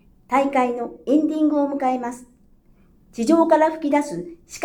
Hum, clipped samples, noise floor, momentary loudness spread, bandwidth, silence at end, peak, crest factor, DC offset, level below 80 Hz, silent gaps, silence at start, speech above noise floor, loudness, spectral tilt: none; under 0.1%; -54 dBFS; 16 LU; 13 kHz; 0 s; -4 dBFS; 16 dB; under 0.1%; -56 dBFS; none; 0.3 s; 34 dB; -20 LUFS; -5.5 dB/octave